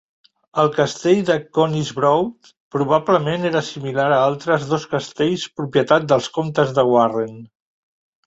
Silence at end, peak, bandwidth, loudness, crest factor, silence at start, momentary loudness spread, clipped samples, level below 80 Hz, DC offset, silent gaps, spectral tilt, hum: 0.8 s; -2 dBFS; 8.2 kHz; -19 LUFS; 18 dB; 0.55 s; 8 LU; under 0.1%; -58 dBFS; under 0.1%; 2.57-2.71 s; -6 dB/octave; none